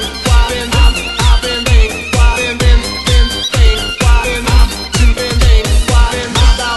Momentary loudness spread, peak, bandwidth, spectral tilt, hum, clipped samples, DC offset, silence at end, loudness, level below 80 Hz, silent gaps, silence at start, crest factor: 2 LU; 0 dBFS; 12.5 kHz; -4 dB/octave; none; 0.5%; 0.3%; 0 s; -12 LUFS; -10 dBFS; none; 0 s; 10 dB